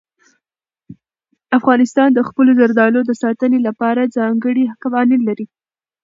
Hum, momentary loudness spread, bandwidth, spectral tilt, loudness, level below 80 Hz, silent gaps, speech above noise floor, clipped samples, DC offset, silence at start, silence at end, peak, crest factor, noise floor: none; 7 LU; 7.6 kHz; -6.5 dB/octave; -14 LUFS; -66 dBFS; none; 75 dB; under 0.1%; under 0.1%; 0.9 s; 0.6 s; 0 dBFS; 16 dB; -89 dBFS